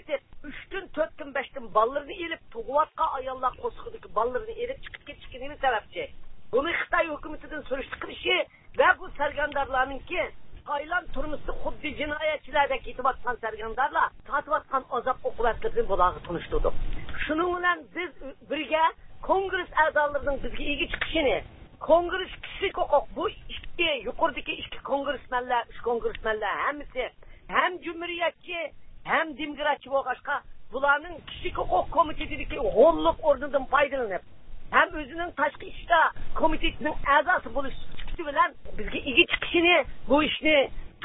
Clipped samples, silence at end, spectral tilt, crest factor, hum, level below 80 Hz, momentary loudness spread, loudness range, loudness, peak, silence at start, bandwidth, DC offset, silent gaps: under 0.1%; 0 s; -8.5 dB/octave; 22 dB; none; -44 dBFS; 14 LU; 5 LU; -27 LUFS; -4 dBFS; 0 s; 4 kHz; under 0.1%; none